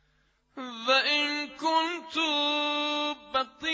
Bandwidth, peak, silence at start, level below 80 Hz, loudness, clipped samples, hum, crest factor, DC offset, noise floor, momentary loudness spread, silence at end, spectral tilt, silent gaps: 8 kHz; -12 dBFS; 0.55 s; -70 dBFS; -27 LUFS; under 0.1%; none; 18 dB; under 0.1%; -69 dBFS; 8 LU; 0 s; -1 dB/octave; none